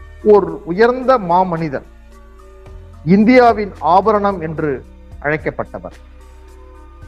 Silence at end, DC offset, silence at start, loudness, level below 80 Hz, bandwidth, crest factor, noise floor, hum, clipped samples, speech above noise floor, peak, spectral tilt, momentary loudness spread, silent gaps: 0 s; under 0.1%; 0 s; -14 LUFS; -38 dBFS; 8.8 kHz; 16 dB; -39 dBFS; none; under 0.1%; 25 dB; 0 dBFS; -8 dB/octave; 17 LU; none